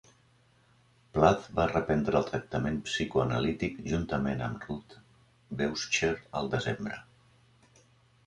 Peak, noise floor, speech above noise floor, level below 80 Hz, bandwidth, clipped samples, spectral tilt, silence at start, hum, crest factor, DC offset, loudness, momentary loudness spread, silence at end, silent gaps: -8 dBFS; -65 dBFS; 35 dB; -50 dBFS; 11 kHz; under 0.1%; -5.5 dB/octave; 1.15 s; none; 24 dB; under 0.1%; -30 LUFS; 12 LU; 1.25 s; none